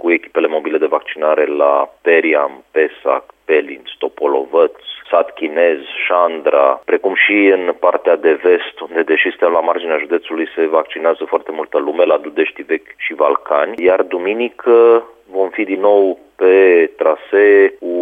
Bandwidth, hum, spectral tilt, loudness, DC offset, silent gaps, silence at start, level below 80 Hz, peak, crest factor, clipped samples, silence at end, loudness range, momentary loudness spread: 3.8 kHz; none; -6 dB/octave; -14 LUFS; under 0.1%; none; 0.05 s; -66 dBFS; 0 dBFS; 14 dB; under 0.1%; 0 s; 4 LU; 9 LU